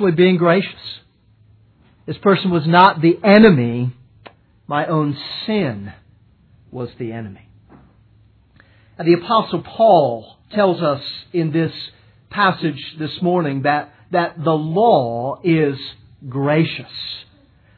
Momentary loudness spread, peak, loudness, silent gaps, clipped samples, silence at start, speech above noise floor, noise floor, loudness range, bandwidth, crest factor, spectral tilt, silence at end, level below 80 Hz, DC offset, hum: 20 LU; 0 dBFS; -17 LUFS; none; under 0.1%; 0 s; 37 dB; -53 dBFS; 10 LU; 4.6 kHz; 18 dB; -9.5 dB/octave; 0.55 s; -56 dBFS; under 0.1%; none